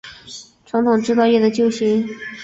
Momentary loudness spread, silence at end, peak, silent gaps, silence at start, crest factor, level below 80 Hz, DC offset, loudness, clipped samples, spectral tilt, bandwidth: 20 LU; 0 s; -4 dBFS; none; 0.05 s; 14 dB; -60 dBFS; under 0.1%; -17 LUFS; under 0.1%; -5.5 dB/octave; 8 kHz